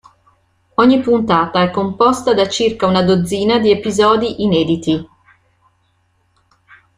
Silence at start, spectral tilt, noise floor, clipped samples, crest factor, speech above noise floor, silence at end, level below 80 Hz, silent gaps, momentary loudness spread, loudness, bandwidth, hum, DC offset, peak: 0.8 s; -5.5 dB/octave; -60 dBFS; under 0.1%; 14 dB; 47 dB; 1.95 s; -50 dBFS; none; 4 LU; -14 LUFS; 14.5 kHz; none; under 0.1%; -2 dBFS